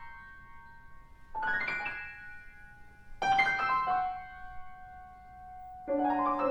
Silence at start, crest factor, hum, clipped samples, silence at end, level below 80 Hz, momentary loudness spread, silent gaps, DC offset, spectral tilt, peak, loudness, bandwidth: 0 s; 20 dB; none; under 0.1%; 0 s; -56 dBFS; 24 LU; none; under 0.1%; -4.5 dB/octave; -14 dBFS; -31 LUFS; 9.4 kHz